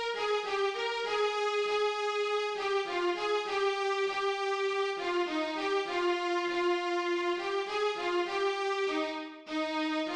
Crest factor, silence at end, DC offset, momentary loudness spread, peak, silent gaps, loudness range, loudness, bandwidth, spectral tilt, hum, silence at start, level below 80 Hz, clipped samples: 12 dB; 0 s; under 0.1%; 2 LU; -20 dBFS; none; 1 LU; -31 LUFS; 10.5 kHz; -2 dB/octave; none; 0 s; -70 dBFS; under 0.1%